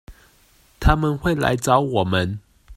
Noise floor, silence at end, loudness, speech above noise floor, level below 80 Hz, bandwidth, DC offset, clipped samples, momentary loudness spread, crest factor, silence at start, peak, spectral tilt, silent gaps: -56 dBFS; 0 s; -20 LUFS; 37 dB; -30 dBFS; 16 kHz; under 0.1%; under 0.1%; 6 LU; 20 dB; 0.1 s; -2 dBFS; -5.5 dB/octave; none